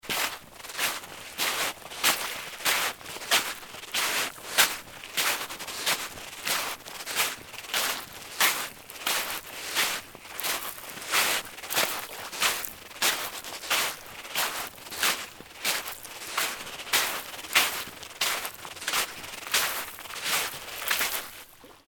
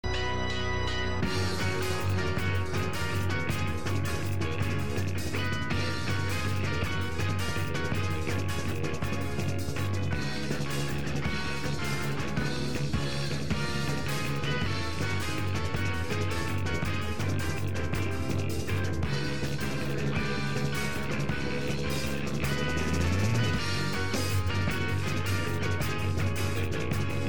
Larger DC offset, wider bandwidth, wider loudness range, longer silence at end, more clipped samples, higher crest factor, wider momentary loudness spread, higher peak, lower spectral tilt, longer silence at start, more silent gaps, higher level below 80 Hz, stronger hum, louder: second, under 0.1% vs 2%; about the same, 19 kHz vs over 20 kHz; about the same, 2 LU vs 2 LU; about the same, 0.1 s vs 0 s; neither; first, 26 dB vs 14 dB; first, 12 LU vs 2 LU; first, -4 dBFS vs -14 dBFS; second, 0.5 dB/octave vs -5 dB/octave; about the same, 0.05 s vs 0.05 s; neither; second, -64 dBFS vs -44 dBFS; neither; first, -28 LUFS vs -31 LUFS